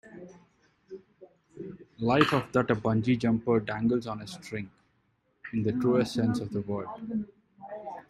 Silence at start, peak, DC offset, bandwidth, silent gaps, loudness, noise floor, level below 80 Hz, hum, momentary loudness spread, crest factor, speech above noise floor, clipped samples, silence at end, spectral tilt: 0.05 s; -6 dBFS; under 0.1%; 12.5 kHz; none; -29 LUFS; -72 dBFS; -60 dBFS; none; 22 LU; 24 dB; 44 dB; under 0.1%; 0.1 s; -7 dB/octave